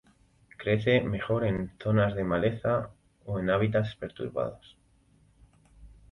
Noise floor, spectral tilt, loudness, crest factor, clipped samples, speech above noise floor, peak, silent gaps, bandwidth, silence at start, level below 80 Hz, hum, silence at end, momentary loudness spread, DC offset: -63 dBFS; -8.5 dB/octave; -29 LUFS; 18 dB; under 0.1%; 36 dB; -12 dBFS; none; 5.8 kHz; 0.6 s; -52 dBFS; none; 0.25 s; 11 LU; under 0.1%